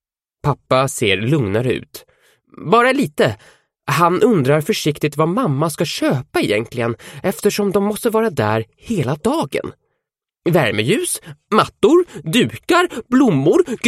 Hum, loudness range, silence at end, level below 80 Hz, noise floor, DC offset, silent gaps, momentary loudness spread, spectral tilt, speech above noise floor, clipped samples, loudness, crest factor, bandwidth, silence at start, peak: none; 3 LU; 0 s; -52 dBFS; -78 dBFS; under 0.1%; none; 10 LU; -5.5 dB/octave; 62 dB; under 0.1%; -17 LUFS; 16 dB; 15.5 kHz; 0.45 s; 0 dBFS